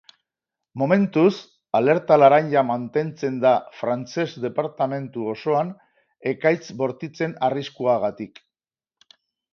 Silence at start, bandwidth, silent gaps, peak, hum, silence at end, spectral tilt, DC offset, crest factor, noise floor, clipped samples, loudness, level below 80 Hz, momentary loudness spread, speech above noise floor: 0.75 s; 6.8 kHz; none; -2 dBFS; none; 1.25 s; -7 dB/octave; under 0.1%; 20 dB; under -90 dBFS; under 0.1%; -22 LUFS; -70 dBFS; 12 LU; over 69 dB